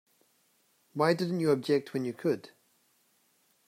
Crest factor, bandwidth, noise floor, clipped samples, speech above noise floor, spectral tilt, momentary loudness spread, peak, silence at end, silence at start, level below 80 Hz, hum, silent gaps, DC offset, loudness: 20 dB; 16 kHz; -70 dBFS; under 0.1%; 41 dB; -6.5 dB/octave; 8 LU; -14 dBFS; 1.2 s; 0.95 s; -80 dBFS; none; none; under 0.1%; -30 LUFS